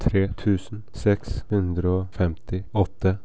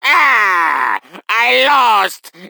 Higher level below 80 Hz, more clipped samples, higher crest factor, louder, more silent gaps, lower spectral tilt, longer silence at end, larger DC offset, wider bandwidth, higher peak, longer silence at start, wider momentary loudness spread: first, -34 dBFS vs -68 dBFS; neither; about the same, 18 dB vs 14 dB; second, -25 LUFS vs -11 LUFS; neither; first, -8.5 dB/octave vs -0.5 dB/octave; about the same, 0.05 s vs 0 s; first, 2% vs under 0.1%; second, 8 kHz vs over 20 kHz; second, -6 dBFS vs 0 dBFS; about the same, 0 s vs 0.05 s; second, 4 LU vs 9 LU